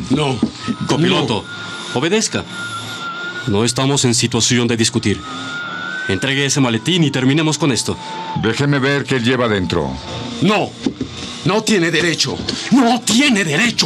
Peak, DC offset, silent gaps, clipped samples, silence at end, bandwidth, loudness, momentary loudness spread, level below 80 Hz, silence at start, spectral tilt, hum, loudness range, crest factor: -2 dBFS; under 0.1%; none; under 0.1%; 0 s; 14 kHz; -16 LUFS; 11 LU; -48 dBFS; 0 s; -4 dB/octave; none; 2 LU; 14 dB